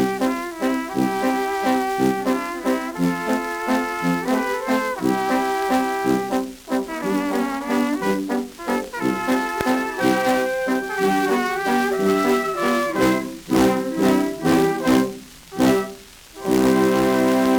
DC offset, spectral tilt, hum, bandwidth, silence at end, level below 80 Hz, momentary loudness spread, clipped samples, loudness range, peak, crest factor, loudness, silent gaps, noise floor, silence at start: under 0.1%; -5 dB/octave; none; over 20 kHz; 0 s; -50 dBFS; 7 LU; under 0.1%; 3 LU; -4 dBFS; 16 dB; -21 LUFS; none; -40 dBFS; 0 s